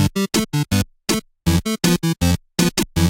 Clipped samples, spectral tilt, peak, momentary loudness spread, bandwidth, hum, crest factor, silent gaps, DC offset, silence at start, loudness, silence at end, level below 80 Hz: under 0.1%; -4.5 dB/octave; -4 dBFS; 3 LU; 17 kHz; none; 16 dB; none; under 0.1%; 0 s; -20 LUFS; 0 s; -34 dBFS